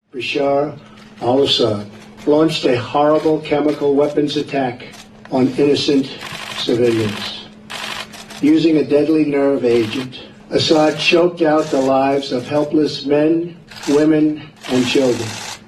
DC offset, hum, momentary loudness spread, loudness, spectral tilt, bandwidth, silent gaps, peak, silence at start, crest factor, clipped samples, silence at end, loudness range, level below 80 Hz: under 0.1%; none; 13 LU; -16 LUFS; -5 dB/octave; 13 kHz; none; 0 dBFS; 0.15 s; 16 dB; under 0.1%; 0.1 s; 3 LU; -52 dBFS